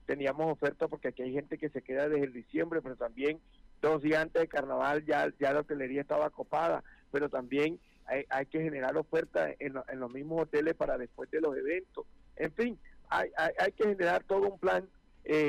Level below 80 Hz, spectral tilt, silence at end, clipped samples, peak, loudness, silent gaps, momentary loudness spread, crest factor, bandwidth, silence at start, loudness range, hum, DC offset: -60 dBFS; -6.5 dB/octave; 0 s; under 0.1%; -22 dBFS; -33 LUFS; none; 9 LU; 10 dB; 12 kHz; 0.1 s; 3 LU; none; under 0.1%